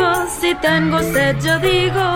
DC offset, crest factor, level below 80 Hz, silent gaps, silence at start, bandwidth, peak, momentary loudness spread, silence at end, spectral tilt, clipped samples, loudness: under 0.1%; 12 dB; -38 dBFS; none; 0 s; 16.5 kHz; -4 dBFS; 2 LU; 0 s; -4.5 dB/octave; under 0.1%; -16 LUFS